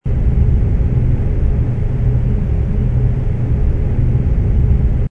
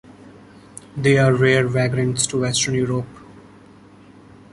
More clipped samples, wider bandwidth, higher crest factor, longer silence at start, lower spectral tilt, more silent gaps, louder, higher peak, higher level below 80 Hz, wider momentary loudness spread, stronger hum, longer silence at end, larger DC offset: neither; second, 3.4 kHz vs 11.5 kHz; second, 12 dB vs 18 dB; second, 0.05 s vs 0.25 s; first, -11 dB/octave vs -4.5 dB/octave; neither; about the same, -16 LUFS vs -18 LUFS; about the same, -2 dBFS vs -2 dBFS; first, -16 dBFS vs -52 dBFS; second, 3 LU vs 20 LU; neither; second, 0 s vs 1.15 s; neither